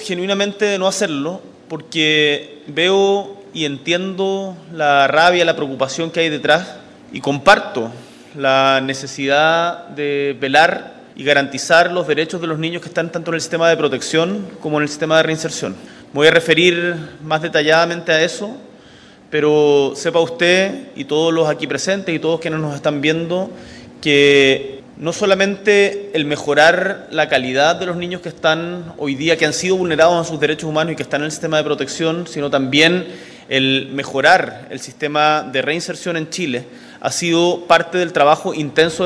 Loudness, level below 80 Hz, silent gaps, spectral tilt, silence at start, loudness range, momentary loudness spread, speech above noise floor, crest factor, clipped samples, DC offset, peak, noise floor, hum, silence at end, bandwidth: -16 LUFS; -56 dBFS; none; -4 dB/octave; 0 s; 2 LU; 12 LU; 27 dB; 16 dB; 0.1%; under 0.1%; 0 dBFS; -43 dBFS; none; 0 s; 11 kHz